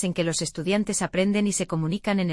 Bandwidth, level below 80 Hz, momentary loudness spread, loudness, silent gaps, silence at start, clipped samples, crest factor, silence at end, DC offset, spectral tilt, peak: 12 kHz; -54 dBFS; 4 LU; -25 LUFS; none; 0 s; under 0.1%; 16 dB; 0 s; under 0.1%; -4.5 dB/octave; -8 dBFS